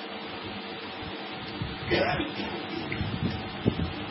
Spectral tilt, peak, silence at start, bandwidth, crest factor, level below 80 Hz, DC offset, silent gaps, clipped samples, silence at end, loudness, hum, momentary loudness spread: -10 dB/octave; -8 dBFS; 0 s; 5.8 kHz; 22 dB; -48 dBFS; under 0.1%; none; under 0.1%; 0 s; -32 LUFS; none; 10 LU